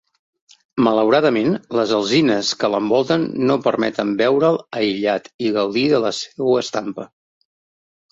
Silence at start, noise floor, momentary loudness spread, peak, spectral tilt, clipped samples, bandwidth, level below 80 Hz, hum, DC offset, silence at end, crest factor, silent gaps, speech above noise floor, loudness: 0.75 s; under -90 dBFS; 7 LU; -2 dBFS; -5 dB/octave; under 0.1%; 7.8 kHz; -62 dBFS; none; under 0.1%; 1.05 s; 16 dB; 5.34-5.39 s; over 72 dB; -18 LUFS